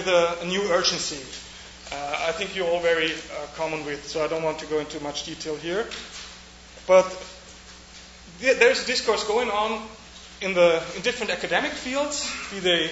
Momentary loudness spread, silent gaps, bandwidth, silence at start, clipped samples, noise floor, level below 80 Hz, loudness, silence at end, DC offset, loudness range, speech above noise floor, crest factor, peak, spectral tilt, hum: 21 LU; none; 8 kHz; 0 s; under 0.1%; -45 dBFS; -52 dBFS; -24 LUFS; 0 s; under 0.1%; 5 LU; 21 dB; 22 dB; -4 dBFS; -2.5 dB/octave; none